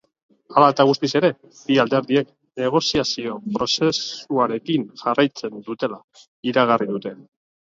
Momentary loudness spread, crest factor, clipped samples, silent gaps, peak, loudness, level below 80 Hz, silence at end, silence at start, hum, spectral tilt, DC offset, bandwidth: 12 LU; 20 dB; under 0.1%; 6.04-6.08 s, 6.28-6.43 s; 0 dBFS; -20 LUFS; -58 dBFS; 0.5 s; 0.5 s; none; -5 dB/octave; under 0.1%; 7.8 kHz